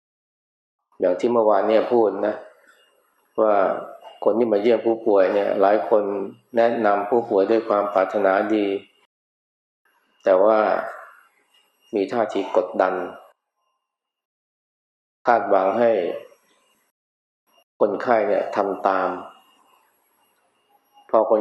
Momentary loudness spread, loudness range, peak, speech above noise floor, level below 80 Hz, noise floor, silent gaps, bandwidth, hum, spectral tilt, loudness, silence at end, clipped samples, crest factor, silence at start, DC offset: 10 LU; 6 LU; -2 dBFS; 62 dB; -82 dBFS; -81 dBFS; 9.06-9.85 s, 14.25-15.25 s, 16.91-17.47 s, 17.63-17.80 s; 7.8 kHz; none; -6.5 dB/octave; -20 LUFS; 0 s; under 0.1%; 20 dB; 1 s; under 0.1%